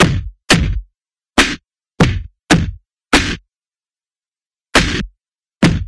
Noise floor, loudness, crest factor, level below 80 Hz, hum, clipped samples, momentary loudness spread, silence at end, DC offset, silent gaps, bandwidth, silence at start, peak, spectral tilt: under -90 dBFS; -15 LUFS; 18 dB; -28 dBFS; none; under 0.1%; 13 LU; 0 s; under 0.1%; none; 11 kHz; 0 s; 0 dBFS; -4.5 dB/octave